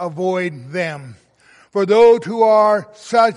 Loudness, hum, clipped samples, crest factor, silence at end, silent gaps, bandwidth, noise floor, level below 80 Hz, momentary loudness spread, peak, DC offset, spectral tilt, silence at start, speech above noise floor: -16 LUFS; none; under 0.1%; 14 dB; 0 s; none; 11 kHz; -51 dBFS; -62 dBFS; 13 LU; -2 dBFS; under 0.1%; -6 dB/octave; 0 s; 36 dB